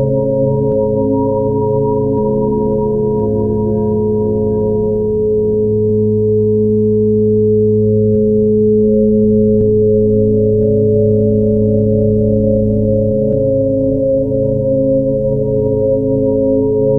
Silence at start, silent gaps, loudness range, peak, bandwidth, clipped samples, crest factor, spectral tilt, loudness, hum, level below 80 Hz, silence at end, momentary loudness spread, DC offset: 0 s; none; 3 LU; 0 dBFS; 1.1 kHz; under 0.1%; 12 dB; -14.5 dB/octave; -13 LUFS; none; -32 dBFS; 0 s; 3 LU; under 0.1%